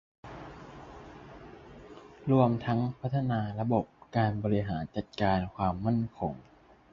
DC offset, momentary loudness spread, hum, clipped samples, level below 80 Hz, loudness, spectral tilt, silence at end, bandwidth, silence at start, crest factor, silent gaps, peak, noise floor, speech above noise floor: under 0.1%; 22 LU; none; under 0.1%; -54 dBFS; -30 LUFS; -9 dB/octave; 0.5 s; 6.8 kHz; 0.25 s; 22 dB; none; -10 dBFS; -50 dBFS; 21 dB